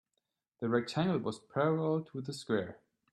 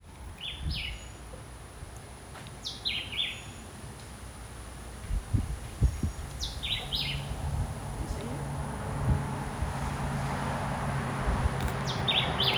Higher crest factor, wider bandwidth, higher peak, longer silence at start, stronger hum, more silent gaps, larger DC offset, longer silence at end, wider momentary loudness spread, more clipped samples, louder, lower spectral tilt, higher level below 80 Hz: about the same, 18 dB vs 20 dB; second, 12 kHz vs over 20 kHz; about the same, -16 dBFS vs -14 dBFS; first, 0.6 s vs 0 s; neither; neither; neither; first, 0.35 s vs 0 s; second, 10 LU vs 14 LU; neither; about the same, -34 LUFS vs -33 LUFS; first, -6.5 dB/octave vs -4.5 dB/octave; second, -72 dBFS vs -38 dBFS